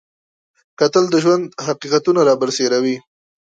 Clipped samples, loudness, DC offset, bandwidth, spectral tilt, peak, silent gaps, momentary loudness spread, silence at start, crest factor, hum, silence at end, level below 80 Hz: under 0.1%; -16 LUFS; under 0.1%; 9 kHz; -4.5 dB/octave; -2 dBFS; none; 9 LU; 0.8 s; 16 dB; none; 0.45 s; -66 dBFS